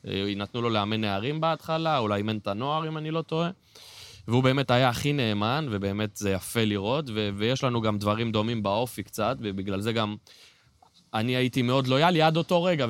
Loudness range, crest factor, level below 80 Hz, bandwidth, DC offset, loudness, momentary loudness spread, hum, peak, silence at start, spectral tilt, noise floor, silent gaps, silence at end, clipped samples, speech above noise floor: 3 LU; 18 dB; -60 dBFS; 16.5 kHz; under 0.1%; -27 LUFS; 8 LU; none; -8 dBFS; 0.05 s; -6 dB/octave; -60 dBFS; none; 0 s; under 0.1%; 34 dB